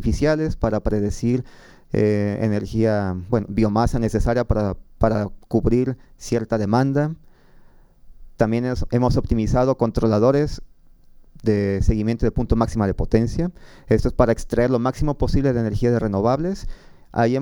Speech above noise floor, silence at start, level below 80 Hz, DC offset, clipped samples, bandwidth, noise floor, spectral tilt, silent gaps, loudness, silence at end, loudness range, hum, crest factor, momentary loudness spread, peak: 28 dB; 0 s; -30 dBFS; under 0.1%; under 0.1%; 16.5 kHz; -48 dBFS; -8 dB/octave; none; -21 LUFS; 0 s; 2 LU; none; 18 dB; 7 LU; -2 dBFS